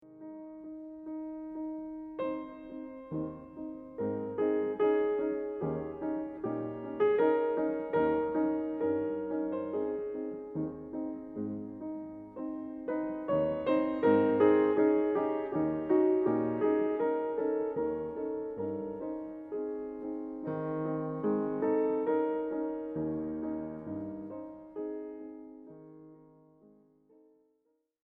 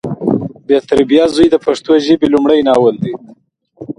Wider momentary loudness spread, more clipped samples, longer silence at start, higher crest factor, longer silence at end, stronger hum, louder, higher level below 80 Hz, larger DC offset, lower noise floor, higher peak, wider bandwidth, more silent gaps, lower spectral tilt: first, 16 LU vs 9 LU; neither; about the same, 0.05 s vs 0.05 s; first, 20 dB vs 12 dB; first, 1.85 s vs 0.05 s; neither; second, -33 LUFS vs -12 LUFS; second, -66 dBFS vs -44 dBFS; neither; first, -77 dBFS vs -36 dBFS; second, -14 dBFS vs 0 dBFS; second, 4 kHz vs 11 kHz; neither; first, -10.5 dB/octave vs -6.5 dB/octave